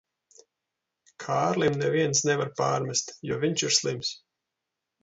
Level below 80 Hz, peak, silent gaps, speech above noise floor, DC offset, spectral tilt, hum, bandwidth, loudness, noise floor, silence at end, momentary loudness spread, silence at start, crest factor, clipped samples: -66 dBFS; -8 dBFS; none; 59 dB; under 0.1%; -3.5 dB/octave; none; 8 kHz; -26 LUFS; -85 dBFS; 0.85 s; 9 LU; 1.2 s; 20 dB; under 0.1%